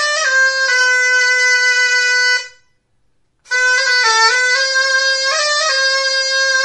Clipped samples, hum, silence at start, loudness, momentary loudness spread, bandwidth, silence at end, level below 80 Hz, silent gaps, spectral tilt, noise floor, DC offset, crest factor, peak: under 0.1%; none; 0 s; -12 LUFS; 3 LU; 11.5 kHz; 0 s; -68 dBFS; none; 5 dB/octave; -63 dBFS; under 0.1%; 14 dB; 0 dBFS